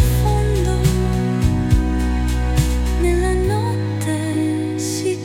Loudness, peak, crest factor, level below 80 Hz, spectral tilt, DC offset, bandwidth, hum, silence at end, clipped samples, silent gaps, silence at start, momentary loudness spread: -19 LUFS; -2 dBFS; 14 dB; -22 dBFS; -6.5 dB/octave; under 0.1%; 16.5 kHz; none; 0 s; under 0.1%; none; 0 s; 4 LU